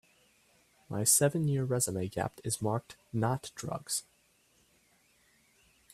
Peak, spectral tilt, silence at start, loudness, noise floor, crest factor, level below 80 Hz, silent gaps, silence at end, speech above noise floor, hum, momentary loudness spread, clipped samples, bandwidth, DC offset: -12 dBFS; -4 dB/octave; 0.9 s; -31 LUFS; -69 dBFS; 22 dB; -66 dBFS; none; 1.9 s; 37 dB; none; 14 LU; under 0.1%; 15.5 kHz; under 0.1%